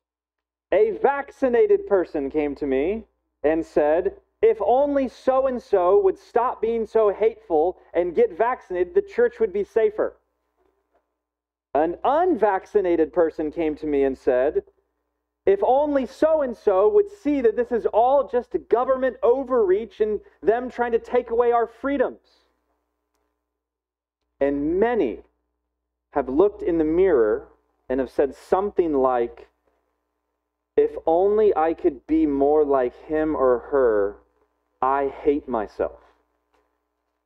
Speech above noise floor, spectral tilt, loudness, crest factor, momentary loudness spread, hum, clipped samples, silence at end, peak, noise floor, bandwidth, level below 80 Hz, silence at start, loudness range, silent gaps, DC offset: 68 dB; -7.5 dB/octave; -22 LUFS; 20 dB; 7 LU; none; under 0.1%; 1.35 s; -4 dBFS; -89 dBFS; 6.8 kHz; -52 dBFS; 0.7 s; 5 LU; none; under 0.1%